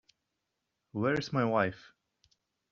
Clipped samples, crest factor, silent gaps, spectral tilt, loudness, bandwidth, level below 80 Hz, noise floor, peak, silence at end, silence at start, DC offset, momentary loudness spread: under 0.1%; 22 dB; none; -5 dB/octave; -31 LUFS; 7.4 kHz; -68 dBFS; -84 dBFS; -14 dBFS; 0.9 s; 0.95 s; under 0.1%; 13 LU